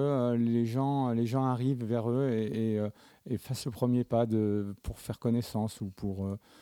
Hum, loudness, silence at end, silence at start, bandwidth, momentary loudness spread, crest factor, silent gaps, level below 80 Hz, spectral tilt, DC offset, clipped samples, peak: none; -31 LUFS; 0.25 s; 0 s; 17 kHz; 10 LU; 16 dB; none; -56 dBFS; -8 dB/octave; under 0.1%; under 0.1%; -14 dBFS